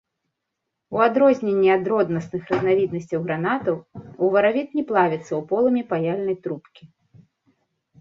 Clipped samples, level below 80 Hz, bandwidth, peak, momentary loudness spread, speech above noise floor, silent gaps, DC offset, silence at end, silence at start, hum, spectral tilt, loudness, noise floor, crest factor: under 0.1%; -62 dBFS; 7.2 kHz; -4 dBFS; 10 LU; 59 dB; none; under 0.1%; 1.15 s; 0.9 s; none; -7.5 dB/octave; -21 LUFS; -80 dBFS; 18 dB